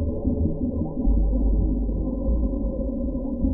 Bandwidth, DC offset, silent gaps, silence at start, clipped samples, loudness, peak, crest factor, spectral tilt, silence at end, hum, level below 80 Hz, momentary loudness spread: 1.1 kHz; under 0.1%; none; 0 s; under 0.1%; -26 LUFS; -10 dBFS; 14 dB; -18.5 dB/octave; 0 s; none; -24 dBFS; 4 LU